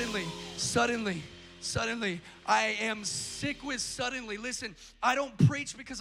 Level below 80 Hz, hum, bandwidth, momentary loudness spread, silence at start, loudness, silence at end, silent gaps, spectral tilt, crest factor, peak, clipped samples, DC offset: -58 dBFS; none; 16 kHz; 11 LU; 0 s; -31 LUFS; 0 s; none; -4 dB/octave; 20 dB; -12 dBFS; under 0.1%; under 0.1%